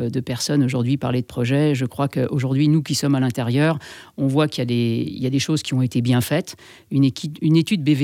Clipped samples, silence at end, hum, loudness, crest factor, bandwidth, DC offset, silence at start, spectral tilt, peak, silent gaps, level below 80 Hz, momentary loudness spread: under 0.1%; 0 s; none; -20 LUFS; 14 dB; 16.5 kHz; under 0.1%; 0 s; -6 dB/octave; -6 dBFS; none; -60 dBFS; 6 LU